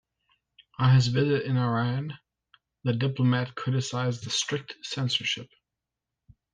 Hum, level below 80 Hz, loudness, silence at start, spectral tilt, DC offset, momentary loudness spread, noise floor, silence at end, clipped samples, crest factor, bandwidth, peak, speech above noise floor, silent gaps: none; -64 dBFS; -27 LUFS; 0.8 s; -5.5 dB/octave; under 0.1%; 12 LU; -87 dBFS; 1.1 s; under 0.1%; 16 dB; 9.6 kHz; -12 dBFS; 61 dB; none